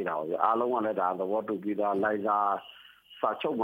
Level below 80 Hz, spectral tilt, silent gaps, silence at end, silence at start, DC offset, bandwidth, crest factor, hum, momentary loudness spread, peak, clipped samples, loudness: -78 dBFS; -7.5 dB/octave; none; 0 s; 0 s; under 0.1%; 16 kHz; 20 dB; none; 6 LU; -10 dBFS; under 0.1%; -29 LUFS